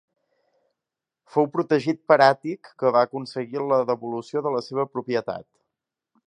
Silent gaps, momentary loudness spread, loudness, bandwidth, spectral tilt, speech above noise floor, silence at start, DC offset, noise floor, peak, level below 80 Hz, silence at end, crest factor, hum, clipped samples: none; 13 LU; -23 LUFS; 10 kHz; -6.5 dB/octave; 65 dB; 1.35 s; under 0.1%; -87 dBFS; -2 dBFS; -74 dBFS; 0.85 s; 24 dB; none; under 0.1%